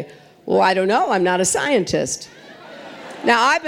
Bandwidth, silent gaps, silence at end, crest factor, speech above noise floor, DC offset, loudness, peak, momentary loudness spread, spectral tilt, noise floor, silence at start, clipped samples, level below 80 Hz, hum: 17 kHz; none; 0 s; 18 dB; 20 dB; under 0.1%; -18 LUFS; -2 dBFS; 21 LU; -3 dB/octave; -38 dBFS; 0 s; under 0.1%; -56 dBFS; none